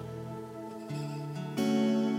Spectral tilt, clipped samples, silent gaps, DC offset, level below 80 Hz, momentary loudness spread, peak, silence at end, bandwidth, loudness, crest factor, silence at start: -6.5 dB/octave; under 0.1%; none; under 0.1%; -72 dBFS; 14 LU; -18 dBFS; 0 s; 16 kHz; -34 LUFS; 14 dB; 0 s